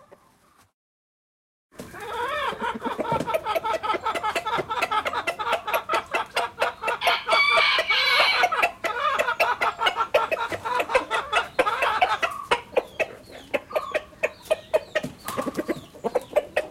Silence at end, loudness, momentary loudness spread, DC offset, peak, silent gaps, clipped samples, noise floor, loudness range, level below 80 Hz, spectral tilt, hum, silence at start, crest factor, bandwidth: 0 s; -24 LUFS; 11 LU; under 0.1%; -4 dBFS; none; under 0.1%; -59 dBFS; 8 LU; -58 dBFS; -2.5 dB/octave; none; 1.8 s; 20 dB; 16.5 kHz